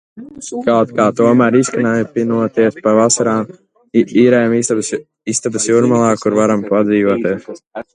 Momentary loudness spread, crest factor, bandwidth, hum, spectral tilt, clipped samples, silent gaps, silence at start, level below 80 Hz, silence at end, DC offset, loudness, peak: 11 LU; 14 dB; 11 kHz; none; -5 dB/octave; under 0.1%; none; 0.15 s; -56 dBFS; 0.1 s; under 0.1%; -14 LUFS; 0 dBFS